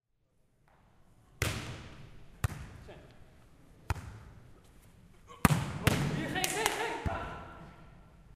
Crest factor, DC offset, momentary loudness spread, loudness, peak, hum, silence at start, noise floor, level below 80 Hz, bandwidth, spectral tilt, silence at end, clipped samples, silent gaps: 34 dB; under 0.1%; 24 LU; -34 LUFS; -2 dBFS; none; 1.4 s; -72 dBFS; -50 dBFS; 15.5 kHz; -4.5 dB/octave; 0.15 s; under 0.1%; none